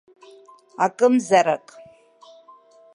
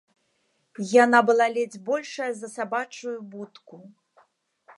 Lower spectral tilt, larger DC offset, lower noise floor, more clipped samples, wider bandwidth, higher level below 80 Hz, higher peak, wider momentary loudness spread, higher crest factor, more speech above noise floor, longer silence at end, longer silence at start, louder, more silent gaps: about the same, -4.5 dB/octave vs -4 dB/octave; neither; second, -51 dBFS vs -71 dBFS; neither; about the same, 11.5 kHz vs 11.5 kHz; first, -78 dBFS vs -84 dBFS; about the same, -4 dBFS vs -4 dBFS; second, 11 LU vs 19 LU; about the same, 20 dB vs 22 dB; second, 32 dB vs 47 dB; first, 1.4 s vs 0.9 s; about the same, 0.8 s vs 0.8 s; first, -20 LUFS vs -23 LUFS; neither